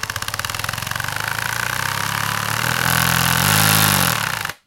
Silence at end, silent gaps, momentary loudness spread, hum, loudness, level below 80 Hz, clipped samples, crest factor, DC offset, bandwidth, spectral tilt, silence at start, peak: 0.1 s; none; 10 LU; none; -18 LUFS; -42 dBFS; under 0.1%; 20 dB; under 0.1%; 17.5 kHz; -2.5 dB/octave; 0 s; 0 dBFS